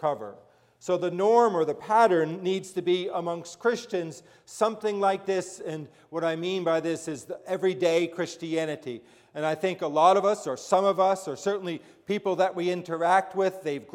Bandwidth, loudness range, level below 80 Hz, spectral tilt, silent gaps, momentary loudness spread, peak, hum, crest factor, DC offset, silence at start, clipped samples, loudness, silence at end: 15 kHz; 4 LU; -78 dBFS; -5 dB/octave; none; 15 LU; -8 dBFS; none; 20 dB; under 0.1%; 0 s; under 0.1%; -26 LUFS; 0.1 s